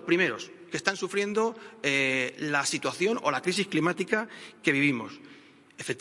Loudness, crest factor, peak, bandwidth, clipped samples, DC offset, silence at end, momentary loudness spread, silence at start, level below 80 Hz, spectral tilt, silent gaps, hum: -28 LUFS; 22 dB; -6 dBFS; 11.5 kHz; under 0.1%; under 0.1%; 0 s; 11 LU; 0 s; -76 dBFS; -4 dB/octave; none; none